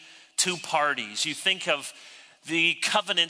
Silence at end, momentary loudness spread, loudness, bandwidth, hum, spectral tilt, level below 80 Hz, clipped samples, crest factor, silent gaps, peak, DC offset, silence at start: 0 s; 12 LU; -25 LUFS; 11 kHz; none; -1 dB/octave; -82 dBFS; under 0.1%; 20 dB; none; -8 dBFS; under 0.1%; 0 s